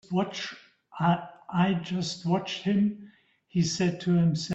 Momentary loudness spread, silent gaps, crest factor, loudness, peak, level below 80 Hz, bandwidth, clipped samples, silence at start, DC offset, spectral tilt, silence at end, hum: 9 LU; none; 18 dB; -28 LUFS; -10 dBFS; -64 dBFS; 8.2 kHz; under 0.1%; 0.1 s; under 0.1%; -6 dB/octave; 0 s; none